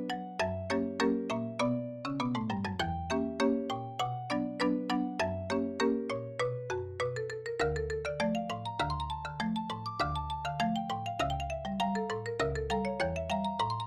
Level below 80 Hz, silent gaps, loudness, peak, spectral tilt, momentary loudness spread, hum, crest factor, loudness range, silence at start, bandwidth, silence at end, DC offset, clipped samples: -50 dBFS; none; -34 LUFS; -16 dBFS; -5.5 dB/octave; 5 LU; none; 16 dB; 2 LU; 0 s; 12.5 kHz; 0 s; under 0.1%; under 0.1%